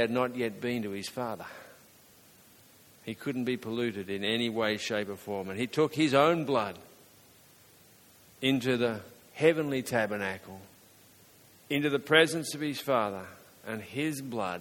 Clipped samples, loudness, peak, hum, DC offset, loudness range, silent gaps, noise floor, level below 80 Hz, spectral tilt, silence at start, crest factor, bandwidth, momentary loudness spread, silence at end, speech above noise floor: under 0.1%; -30 LUFS; -6 dBFS; none; under 0.1%; 7 LU; none; -58 dBFS; -72 dBFS; -4.5 dB/octave; 0 s; 26 dB; 17.5 kHz; 18 LU; 0 s; 29 dB